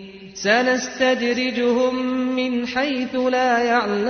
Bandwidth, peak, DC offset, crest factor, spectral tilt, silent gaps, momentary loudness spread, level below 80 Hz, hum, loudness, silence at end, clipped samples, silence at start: 6.6 kHz; -4 dBFS; under 0.1%; 16 dB; -3.5 dB/octave; none; 5 LU; -58 dBFS; none; -20 LUFS; 0 s; under 0.1%; 0 s